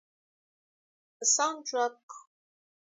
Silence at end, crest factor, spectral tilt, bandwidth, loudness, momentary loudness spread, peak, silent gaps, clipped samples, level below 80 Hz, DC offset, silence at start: 0.7 s; 24 dB; 2 dB/octave; 8 kHz; -28 LUFS; 8 LU; -10 dBFS; 2.03-2.09 s; under 0.1%; under -90 dBFS; under 0.1%; 1.2 s